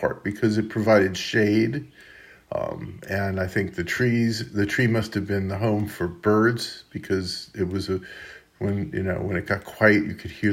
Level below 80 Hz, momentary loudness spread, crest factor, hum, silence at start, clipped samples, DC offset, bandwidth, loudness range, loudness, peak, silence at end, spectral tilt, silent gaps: -56 dBFS; 12 LU; 20 dB; none; 0 s; under 0.1%; under 0.1%; 16 kHz; 3 LU; -24 LUFS; -4 dBFS; 0 s; -6 dB/octave; none